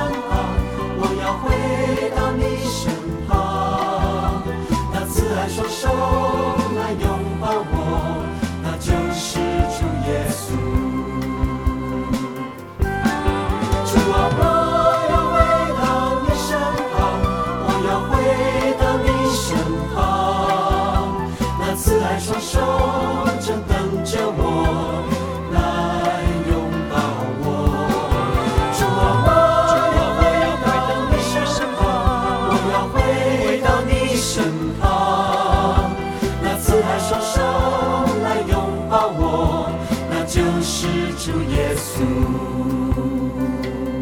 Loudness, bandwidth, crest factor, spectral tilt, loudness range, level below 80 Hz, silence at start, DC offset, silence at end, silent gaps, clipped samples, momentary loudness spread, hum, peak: -19 LUFS; 18 kHz; 18 dB; -5.5 dB/octave; 5 LU; -28 dBFS; 0 s; 0.1%; 0 s; none; under 0.1%; 7 LU; none; 0 dBFS